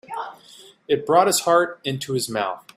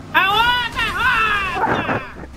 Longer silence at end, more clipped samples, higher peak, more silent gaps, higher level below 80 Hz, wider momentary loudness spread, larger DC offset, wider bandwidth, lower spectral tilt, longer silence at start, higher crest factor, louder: first, 0.15 s vs 0 s; neither; about the same, -2 dBFS vs -2 dBFS; neither; second, -66 dBFS vs -38 dBFS; first, 16 LU vs 6 LU; neither; about the same, 16 kHz vs 15.5 kHz; about the same, -3.5 dB/octave vs -3.5 dB/octave; about the same, 0.1 s vs 0 s; about the same, 20 dB vs 16 dB; second, -21 LUFS vs -17 LUFS